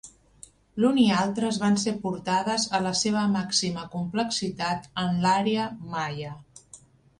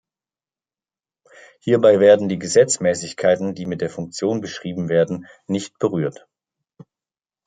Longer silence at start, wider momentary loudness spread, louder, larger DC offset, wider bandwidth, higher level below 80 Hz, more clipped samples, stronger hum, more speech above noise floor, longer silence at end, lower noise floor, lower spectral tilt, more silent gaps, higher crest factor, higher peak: second, 0.05 s vs 1.65 s; second, 10 LU vs 13 LU; second, -25 LUFS vs -19 LUFS; neither; first, 11 kHz vs 9.6 kHz; about the same, -60 dBFS vs -64 dBFS; neither; neither; second, 28 dB vs over 71 dB; second, 0.4 s vs 1.35 s; second, -53 dBFS vs under -90 dBFS; about the same, -4.5 dB/octave vs -5 dB/octave; neither; about the same, 18 dB vs 18 dB; second, -8 dBFS vs -2 dBFS